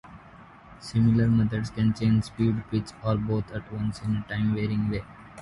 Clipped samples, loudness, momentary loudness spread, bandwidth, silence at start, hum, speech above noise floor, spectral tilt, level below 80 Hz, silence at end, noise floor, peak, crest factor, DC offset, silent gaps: under 0.1%; -26 LUFS; 10 LU; 11.5 kHz; 0.05 s; none; 24 dB; -8 dB/octave; -46 dBFS; 0 s; -49 dBFS; -12 dBFS; 16 dB; under 0.1%; none